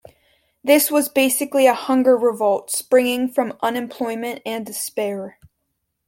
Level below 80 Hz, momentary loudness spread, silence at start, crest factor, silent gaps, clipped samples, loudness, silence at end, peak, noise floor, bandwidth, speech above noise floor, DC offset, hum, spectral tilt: -64 dBFS; 11 LU; 0.65 s; 18 dB; none; under 0.1%; -19 LUFS; 0.75 s; -2 dBFS; -74 dBFS; 17 kHz; 56 dB; under 0.1%; none; -2.5 dB/octave